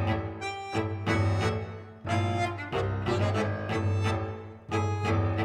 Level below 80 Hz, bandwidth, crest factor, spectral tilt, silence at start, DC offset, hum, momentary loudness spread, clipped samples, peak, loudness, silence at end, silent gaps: -50 dBFS; 9.6 kHz; 16 dB; -6.5 dB/octave; 0 s; under 0.1%; none; 8 LU; under 0.1%; -14 dBFS; -30 LUFS; 0 s; none